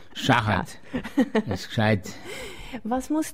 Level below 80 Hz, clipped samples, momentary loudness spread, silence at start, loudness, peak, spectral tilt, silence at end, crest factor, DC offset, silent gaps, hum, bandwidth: -50 dBFS; under 0.1%; 15 LU; 0.15 s; -25 LUFS; -6 dBFS; -5.5 dB/octave; 0 s; 20 dB; 0.7%; none; none; 16 kHz